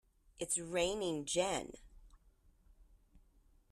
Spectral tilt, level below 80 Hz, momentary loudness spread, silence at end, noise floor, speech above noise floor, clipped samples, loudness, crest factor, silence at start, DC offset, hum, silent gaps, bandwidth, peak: -2.5 dB/octave; -62 dBFS; 9 LU; 0.55 s; -68 dBFS; 31 dB; under 0.1%; -37 LUFS; 20 dB; 0.4 s; under 0.1%; none; none; 14 kHz; -22 dBFS